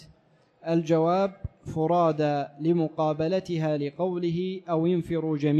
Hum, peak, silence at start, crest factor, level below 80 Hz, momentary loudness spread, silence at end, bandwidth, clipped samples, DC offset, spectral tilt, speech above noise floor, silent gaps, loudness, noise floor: none; -12 dBFS; 0 s; 14 dB; -56 dBFS; 7 LU; 0 s; 8.4 kHz; under 0.1%; under 0.1%; -8.5 dB/octave; 37 dB; none; -26 LUFS; -62 dBFS